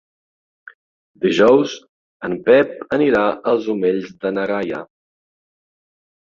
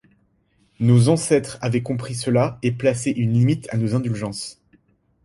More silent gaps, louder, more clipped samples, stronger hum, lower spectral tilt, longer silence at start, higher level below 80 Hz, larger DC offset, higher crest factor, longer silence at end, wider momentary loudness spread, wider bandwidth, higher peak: first, 1.89-2.20 s vs none; first, -17 LUFS vs -21 LUFS; neither; neither; about the same, -6 dB/octave vs -6.5 dB/octave; first, 1.2 s vs 0.8 s; second, -60 dBFS vs -54 dBFS; neither; about the same, 18 dB vs 18 dB; first, 1.35 s vs 0.75 s; about the same, 13 LU vs 11 LU; second, 7.4 kHz vs 11.5 kHz; about the same, -2 dBFS vs -4 dBFS